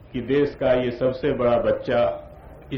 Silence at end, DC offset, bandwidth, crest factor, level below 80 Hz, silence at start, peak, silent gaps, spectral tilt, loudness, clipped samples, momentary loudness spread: 0 s; under 0.1%; 6.2 kHz; 14 dB; -44 dBFS; 0.05 s; -8 dBFS; none; -8.5 dB/octave; -22 LUFS; under 0.1%; 4 LU